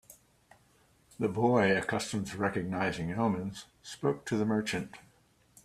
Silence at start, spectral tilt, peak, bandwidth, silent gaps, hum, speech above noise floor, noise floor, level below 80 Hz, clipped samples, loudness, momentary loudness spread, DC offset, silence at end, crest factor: 0.1 s; -5.5 dB/octave; -12 dBFS; 14.5 kHz; none; none; 35 dB; -66 dBFS; -64 dBFS; under 0.1%; -31 LUFS; 11 LU; under 0.1%; 0.65 s; 20 dB